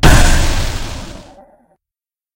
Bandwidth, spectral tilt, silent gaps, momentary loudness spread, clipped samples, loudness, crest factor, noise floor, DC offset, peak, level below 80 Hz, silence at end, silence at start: 16.5 kHz; -4 dB/octave; none; 22 LU; 0.5%; -15 LUFS; 14 dB; -89 dBFS; under 0.1%; 0 dBFS; -16 dBFS; 1.15 s; 0.05 s